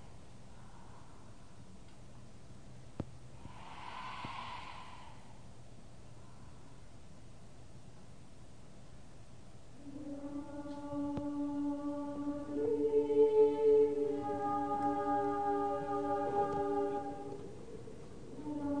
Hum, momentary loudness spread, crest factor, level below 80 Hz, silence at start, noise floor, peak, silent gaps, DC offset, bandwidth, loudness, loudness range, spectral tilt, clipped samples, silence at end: none; 26 LU; 20 dB; -62 dBFS; 0 s; -56 dBFS; -18 dBFS; none; 0.3%; 10 kHz; -35 LUFS; 25 LU; -7 dB/octave; under 0.1%; 0 s